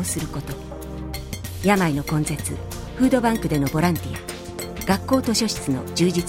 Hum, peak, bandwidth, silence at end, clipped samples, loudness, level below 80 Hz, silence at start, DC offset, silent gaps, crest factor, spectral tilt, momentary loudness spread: none; -4 dBFS; 17 kHz; 0 s; under 0.1%; -23 LUFS; -38 dBFS; 0 s; under 0.1%; none; 18 dB; -5 dB/octave; 13 LU